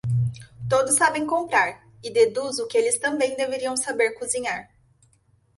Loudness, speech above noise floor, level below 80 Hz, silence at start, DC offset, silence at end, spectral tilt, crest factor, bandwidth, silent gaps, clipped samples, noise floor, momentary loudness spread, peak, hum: -23 LUFS; 39 dB; -56 dBFS; 0.05 s; under 0.1%; 0.95 s; -3.5 dB/octave; 18 dB; 12 kHz; none; under 0.1%; -62 dBFS; 9 LU; -6 dBFS; none